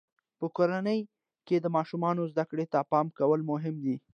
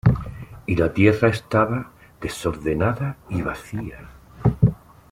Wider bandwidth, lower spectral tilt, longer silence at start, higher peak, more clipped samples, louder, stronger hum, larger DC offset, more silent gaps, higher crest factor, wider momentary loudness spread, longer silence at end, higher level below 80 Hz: second, 6.8 kHz vs 15.5 kHz; first, -9 dB/octave vs -7.5 dB/octave; first, 0.4 s vs 0.05 s; second, -12 dBFS vs -2 dBFS; neither; second, -30 LUFS vs -22 LUFS; neither; neither; neither; about the same, 18 dB vs 20 dB; second, 7 LU vs 18 LU; second, 0.15 s vs 0.35 s; second, -82 dBFS vs -38 dBFS